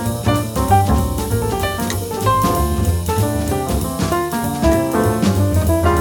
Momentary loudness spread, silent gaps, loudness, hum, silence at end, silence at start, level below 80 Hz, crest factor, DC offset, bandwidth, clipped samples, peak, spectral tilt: 4 LU; none; -17 LUFS; none; 0 s; 0 s; -26 dBFS; 16 dB; under 0.1%; over 20 kHz; under 0.1%; 0 dBFS; -6 dB/octave